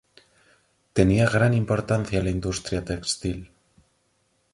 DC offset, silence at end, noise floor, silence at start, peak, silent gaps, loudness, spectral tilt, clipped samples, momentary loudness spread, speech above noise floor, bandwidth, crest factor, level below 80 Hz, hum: under 0.1%; 1.1 s; -69 dBFS; 0.95 s; -4 dBFS; none; -24 LUFS; -5.5 dB/octave; under 0.1%; 10 LU; 46 dB; 11.5 kHz; 22 dB; -42 dBFS; none